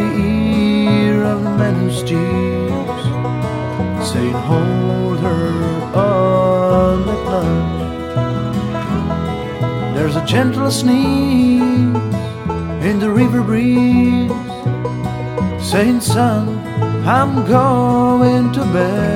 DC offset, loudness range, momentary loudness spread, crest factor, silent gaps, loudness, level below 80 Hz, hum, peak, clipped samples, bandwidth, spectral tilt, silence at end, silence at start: under 0.1%; 3 LU; 8 LU; 14 dB; none; -16 LUFS; -36 dBFS; none; 0 dBFS; under 0.1%; 16 kHz; -7 dB/octave; 0 s; 0 s